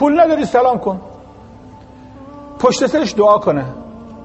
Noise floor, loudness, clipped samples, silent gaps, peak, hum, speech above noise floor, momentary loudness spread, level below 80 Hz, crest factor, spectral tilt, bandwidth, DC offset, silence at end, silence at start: -38 dBFS; -14 LUFS; under 0.1%; none; 0 dBFS; none; 25 dB; 23 LU; -46 dBFS; 16 dB; -5.5 dB/octave; 8.4 kHz; under 0.1%; 0 s; 0 s